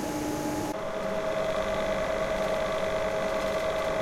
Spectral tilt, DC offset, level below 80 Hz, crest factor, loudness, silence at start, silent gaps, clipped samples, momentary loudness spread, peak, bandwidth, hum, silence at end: -4.5 dB/octave; under 0.1%; -46 dBFS; 12 dB; -29 LUFS; 0 s; none; under 0.1%; 3 LU; -18 dBFS; 16.5 kHz; none; 0 s